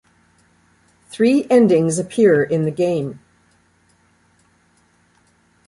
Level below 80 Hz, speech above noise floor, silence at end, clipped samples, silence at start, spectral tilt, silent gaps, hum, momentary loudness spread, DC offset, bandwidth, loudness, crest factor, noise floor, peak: -60 dBFS; 43 dB; 2.5 s; under 0.1%; 1.15 s; -6.5 dB/octave; none; none; 10 LU; under 0.1%; 11.5 kHz; -16 LUFS; 18 dB; -58 dBFS; -2 dBFS